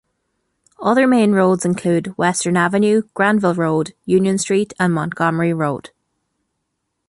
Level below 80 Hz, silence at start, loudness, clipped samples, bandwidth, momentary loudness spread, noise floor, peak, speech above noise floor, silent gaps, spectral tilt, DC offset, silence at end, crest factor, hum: -60 dBFS; 0.8 s; -17 LUFS; under 0.1%; 11.5 kHz; 6 LU; -74 dBFS; -2 dBFS; 58 dB; none; -5.5 dB/octave; under 0.1%; 1.2 s; 14 dB; none